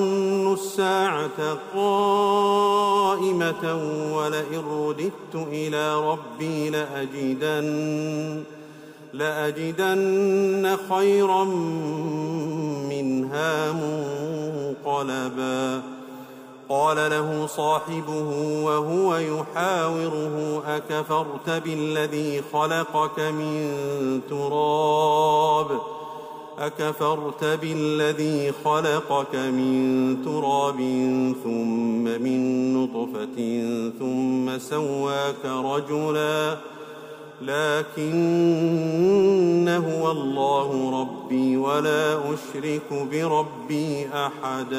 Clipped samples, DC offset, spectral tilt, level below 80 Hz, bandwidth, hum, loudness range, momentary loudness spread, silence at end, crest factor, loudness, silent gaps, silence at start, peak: under 0.1%; under 0.1%; -5.5 dB/octave; -72 dBFS; 16 kHz; none; 5 LU; 9 LU; 0 s; 14 dB; -24 LUFS; none; 0 s; -10 dBFS